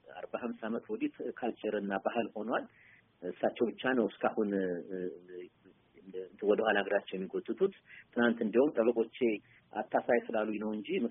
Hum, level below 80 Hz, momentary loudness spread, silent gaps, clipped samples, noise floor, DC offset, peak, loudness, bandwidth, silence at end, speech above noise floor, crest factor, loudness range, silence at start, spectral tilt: none; -78 dBFS; 15 LU; none; under 0.1%; -61 dBFS; under 0.1%; -14 dBFS; -34 LUFS; 3.8 kHz; 0 s; 28 dB; 20 dB; 4 LU; 0.1 s; -1.5 dB/octave